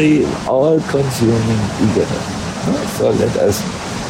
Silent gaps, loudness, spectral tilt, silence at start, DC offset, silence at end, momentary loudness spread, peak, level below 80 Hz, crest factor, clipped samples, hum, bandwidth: none; -16 LUFS; -6 dB/octave; 0 s; under 0.1%; 0 s; 7 LU; -2 dBFS; -38 dBFS; 12 dB; under 0.1%; none; 16.5 kHz